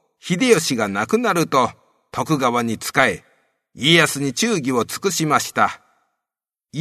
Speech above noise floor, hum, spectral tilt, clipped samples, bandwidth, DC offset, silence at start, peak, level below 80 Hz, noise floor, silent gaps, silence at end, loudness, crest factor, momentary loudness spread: 69 dB; none; -3.5 dB/octave; under 0.1%; 13.5 kHz; under 0.1%; 0.25 s; 0 dBFS; -60 dBFS; -87 dBFS; none; 0 s; -18 LUFS; 20 dB; 10 LU